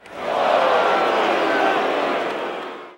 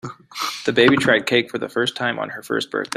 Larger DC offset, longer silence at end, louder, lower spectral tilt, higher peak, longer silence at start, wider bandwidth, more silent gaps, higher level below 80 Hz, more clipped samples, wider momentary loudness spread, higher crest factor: neither; about the same, 0.05 s vs 0 s; about the same, -19 LUFS vs -19 LUFS; about the same, -3.5 dB/octave vs -4 dB/octave; second, -6 dBFS vs -2 dBFS; about the same, 0.05 s vs 0.05 s; about the same, 16 kHz vs 15.5 kHz; neither; about the same, -64 dBFS vs -62 dBFS; neither; second, 9 LU vs 12 LU; about the same, 14 dB vs 18 dB